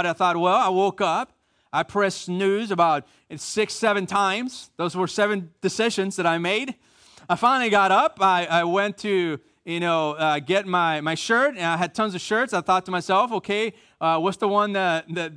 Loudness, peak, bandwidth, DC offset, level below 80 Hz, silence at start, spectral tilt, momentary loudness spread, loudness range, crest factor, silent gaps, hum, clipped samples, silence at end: -22 LUFS; -6 dBFS; 10.5 kHz; under 0.1%; -68 dBFS; 0 s; -4.5 dB/octave; 9 LU; 3 LU; 16 dB; none; none; under 0.1%; 0 s